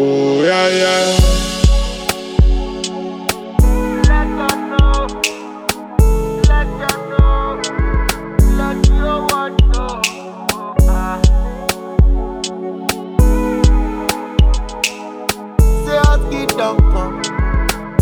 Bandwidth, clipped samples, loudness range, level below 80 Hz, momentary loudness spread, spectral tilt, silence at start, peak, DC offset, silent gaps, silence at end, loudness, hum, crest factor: 18.5 kHz; under 0.1%; 1 LU; -16 dBFS; 8 LU; -5 dB/octave; 0 s; 0 dBFS; under 0.1%; none; 0 s; -16 LUFS; none; 14 dB